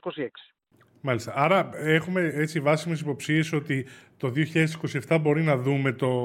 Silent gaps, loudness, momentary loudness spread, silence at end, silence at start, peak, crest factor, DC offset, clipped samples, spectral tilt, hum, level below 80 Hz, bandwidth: none; -26 LUFS; 10 LU; 0 s; 0.05 s; -6 dBFS; 20 dB; under 0.1%; under 0.1%; -6.5 dB/octave; none; -70 dBFS; 16 kHz